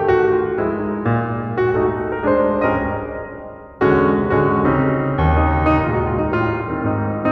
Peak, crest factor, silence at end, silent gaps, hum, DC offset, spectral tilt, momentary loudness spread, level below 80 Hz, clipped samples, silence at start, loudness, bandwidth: -4 dBFS; 14 dB; 0 s; none; none; under 0.1%; -10 dB/octave; 7 LU; -30 dBFS; under 0.1%; 0 s; -18 LUFS; 6 kHz